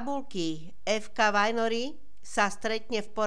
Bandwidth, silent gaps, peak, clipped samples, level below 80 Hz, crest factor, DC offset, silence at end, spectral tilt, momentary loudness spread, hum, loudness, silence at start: 11 kHz; none; -10 dBFS; under 0.1%; -60 dBFS; 18 dB; 2%; 0 s; -3.5 dB/octave; 10 LU; none; -29 LUFS; 0 s